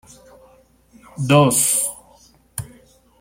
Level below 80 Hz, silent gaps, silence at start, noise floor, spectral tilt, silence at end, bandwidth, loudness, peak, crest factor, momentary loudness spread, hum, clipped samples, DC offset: -54 dBFS; none; 1.15 s; -53 dBFS; -4 dB/octave; 0.55 s; 16.5 kHz; -16 LUFS; -2 dBFS; 20 dB; 26 LU; none; under 0.1%; under 0.1%